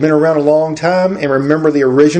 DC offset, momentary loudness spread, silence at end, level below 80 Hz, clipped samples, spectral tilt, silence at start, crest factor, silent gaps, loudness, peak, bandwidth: under 0.1%; 3 LU; 0 s; -52 dBFS; 0.1%; -7 dB/octave; 0 s; 12 dB; none; -12 LUFS; 0 dBFS; 9.2 kHz